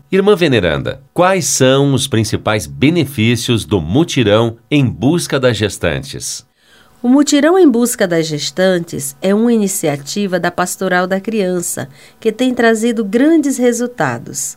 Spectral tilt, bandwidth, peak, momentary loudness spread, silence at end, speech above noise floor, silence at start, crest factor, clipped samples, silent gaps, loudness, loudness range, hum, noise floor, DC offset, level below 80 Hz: -5 dB/octave; 16.5 kHz; 0 dBFS; 9 LU; 0.05 s; 35 dB; 0.1 s; 14 dB; under 0.1%; none; -14 LUFS; 3 LU; none; -48 dBFS; 0.2%; -42 dBFS